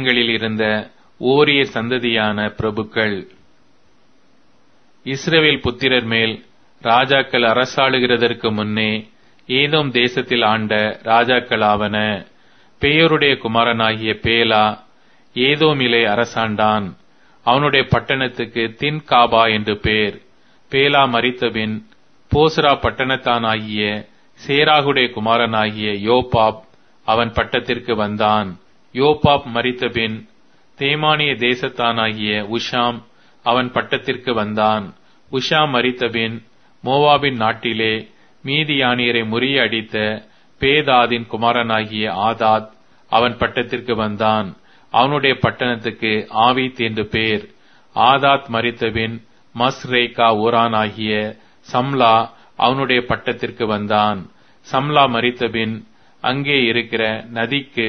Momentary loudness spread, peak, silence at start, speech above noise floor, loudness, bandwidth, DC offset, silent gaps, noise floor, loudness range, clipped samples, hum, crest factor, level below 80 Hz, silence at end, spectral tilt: 9 LU; 0 dBFS; 0 s; 40 dB; -17 LUFS; 6.6 kHz; 0.3%; none; -57 dBFS; 3 LU; under 0.1%; none; 18 dB; -46 dBFS; 0 s; -5.5 dB/octave